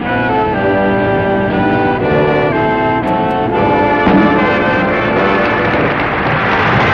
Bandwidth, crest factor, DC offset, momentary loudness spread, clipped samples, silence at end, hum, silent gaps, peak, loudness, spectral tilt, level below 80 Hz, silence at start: 7.2 kHz; 10 dB; under 0.1%; 3 LU; under 0.1%; 0 s; none; none; -2 dBFS; -12 LUFS; -8 dB/octave; -34 dBFS; 0 s